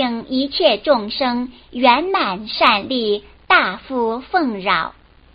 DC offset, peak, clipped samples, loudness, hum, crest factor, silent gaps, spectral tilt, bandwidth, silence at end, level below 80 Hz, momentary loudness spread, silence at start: under 0.1%; 0 dBFS; under 0.1%; -17 LUFS; none; 18 dB; none; -0.5 dB/octave; 5.4 kHz; 0.45 s; -50 dBFS; 7 LU; 0 s